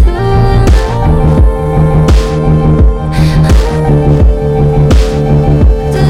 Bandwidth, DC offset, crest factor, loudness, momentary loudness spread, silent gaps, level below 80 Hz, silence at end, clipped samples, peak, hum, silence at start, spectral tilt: 11.5 kHz; under 0.1%; 6 dB; -9 LUFS; 3 LU; none; -10 dBFS; 0 s; under 0.1%; 0 dBFS; none; 0 s; -8 dB/octave